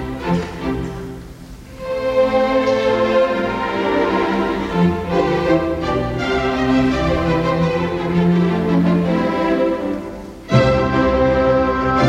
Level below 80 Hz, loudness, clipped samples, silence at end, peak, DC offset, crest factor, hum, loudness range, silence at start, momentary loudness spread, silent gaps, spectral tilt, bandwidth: -34 dBFS; -17 LUFS; under 0.1%; 0 s; -2 dBFS; under 0.1%; 16 dB; none; 2 LU; 0 s; 10 LU; none; -7.5 dB/octave; 10 kHz